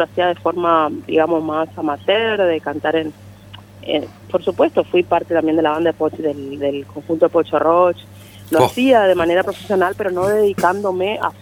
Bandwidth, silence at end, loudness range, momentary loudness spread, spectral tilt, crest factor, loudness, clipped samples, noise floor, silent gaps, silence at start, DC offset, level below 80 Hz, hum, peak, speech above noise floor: 18 kHz; 0.1 s; 3 LU; 8 LU; -5.5 dB/octave; 16 dB; -17 LUFS; under 0.1%; -39 dBFS; none; 0 s; under 0.1%; -54 dBFS; 50 Hz at -40 dBFS; 0 dBFS; 23 dB